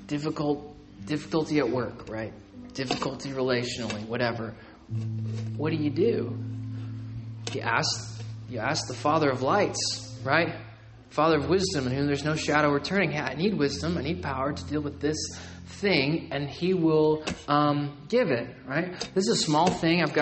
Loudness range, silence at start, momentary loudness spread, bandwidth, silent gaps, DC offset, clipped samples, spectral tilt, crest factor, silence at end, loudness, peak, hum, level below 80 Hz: 5 LU; 0 s; 13 LU; 8.8 kHz; none; under 0.1%; under 0.1%; -5 dB/octave; 20 dB; 0 s; -27 LUFS; -6 dBFS; none; -56 dBFS